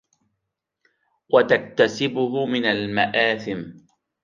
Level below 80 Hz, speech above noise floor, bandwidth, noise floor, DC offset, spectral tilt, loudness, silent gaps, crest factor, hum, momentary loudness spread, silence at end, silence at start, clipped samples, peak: -64 dBFS; 59 dB; 7.4 kHz; -80 dBFS; under 0.1%; -5 dB/octave; -21 LUFS; none; 20 dB; none; 11 LU; 0.45 s; 1.3 s; under 0.1%; -4 dBFS